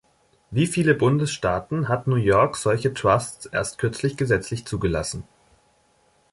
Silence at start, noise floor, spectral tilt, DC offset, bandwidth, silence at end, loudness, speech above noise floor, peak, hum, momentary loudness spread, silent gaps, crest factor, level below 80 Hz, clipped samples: 0.5 s; -62 dBFS; -5.5 dB/octave; under 0.1%; 11.5 kHz; 1.1 s; -23 LUFS; 40 dB; -4 dBFS; none; 8 LU; none; 18 dB; -46 dBFS; under 0.1%